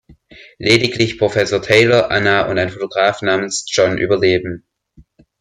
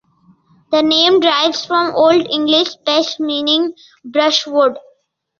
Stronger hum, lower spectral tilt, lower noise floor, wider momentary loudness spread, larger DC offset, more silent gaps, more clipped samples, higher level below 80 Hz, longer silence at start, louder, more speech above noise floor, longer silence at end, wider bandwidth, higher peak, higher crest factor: neither; first, -4.5 dB/octave vs -3 dB/octave; second, -50 dBFS vs -56 dBFS; about the same, 8 LU vs 7 LU; neither; neither; neither; first, -48 dBFS vs -62 dBFS; second, 0.4 s vs 0.7 s; about the same, -15 LUFS vs -14 LUFS; second, 35 dB vs 42 dB; first, 0.8 s vs 0.6 s; first, 13 kHz vs 7.2 kHz; about the same, 0 dBFS vs 0 dBFS; about the same, 16 dB vs 14 dB